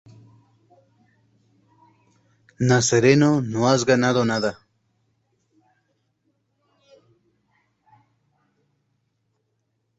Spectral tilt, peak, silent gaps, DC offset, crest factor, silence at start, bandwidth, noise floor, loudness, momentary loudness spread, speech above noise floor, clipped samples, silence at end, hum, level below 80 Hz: -5 dB/octave; -4 dBFS; none; under 0.1%; 22 dB; 2.6 s; 8.2 kHz; -73 dBFS; -19 LUFS; 9 LU; 55 dB; under 0.1%; 5.45 s; none; -60 dBFS